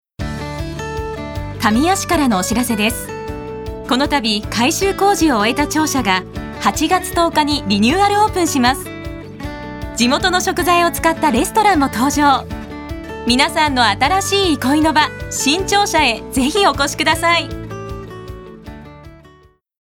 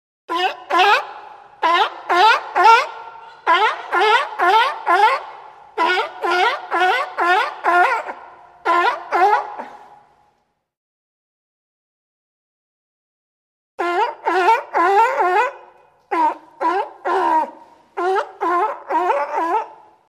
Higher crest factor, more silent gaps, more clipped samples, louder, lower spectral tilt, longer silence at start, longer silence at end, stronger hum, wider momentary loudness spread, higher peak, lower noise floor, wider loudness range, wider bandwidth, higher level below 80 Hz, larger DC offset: about the same, 16 dB vs 18 dB; second, none vs 10.77-13.78 s; neither; about the same, -15 LUFS vs -17 LUFS; first, -3.5 dB/octave vs -1 dB/octave; about the same, 0.2 s vs 0.3 s; first, 0.65 s vs 0.35 s; neither; first, 15 LU vs 12 LU; about the same, 0 dBFS vs 0 dBFS; second, -49 dBFS vs -65 dBFS; second, 4 LU vs 7 LU; first, 19 kHz vs 13.5 kHz; first, -34 dBFS vs -74 dBFS; neither